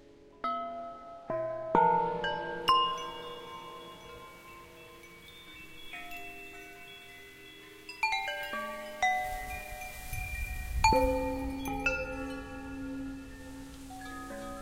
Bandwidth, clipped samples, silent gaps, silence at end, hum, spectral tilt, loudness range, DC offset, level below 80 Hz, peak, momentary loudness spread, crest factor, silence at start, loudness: 16 kHz; under 0.1%; none; 0 s; none; -4 dB/octave; 15 LU; under 0.1%; -46 dBFS; -10 dBFS; 22 LU; 24 dB; 0 s; -33 LUFS